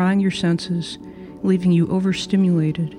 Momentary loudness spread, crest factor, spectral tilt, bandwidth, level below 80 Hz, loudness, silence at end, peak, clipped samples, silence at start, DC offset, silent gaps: 11 LU; 12 dB; -7 dB/octave; 10.5 kHz; -52 dBFS; -20 LUFS; 0 s; -6 dBFS; under 0.1%; 0 s; under 0.1%; none